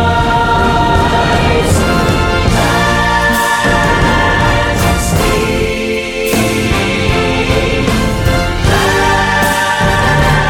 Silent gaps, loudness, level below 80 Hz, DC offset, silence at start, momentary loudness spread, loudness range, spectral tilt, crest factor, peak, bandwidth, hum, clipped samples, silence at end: none; -11 LUFS; -20 dBFS; under 0.1%; 0 s; 3 LU; 2 LU; -4.5 dB/octave; 10 dB; 0 dBFS; 19 kHz; none; under 0.1%; 0 s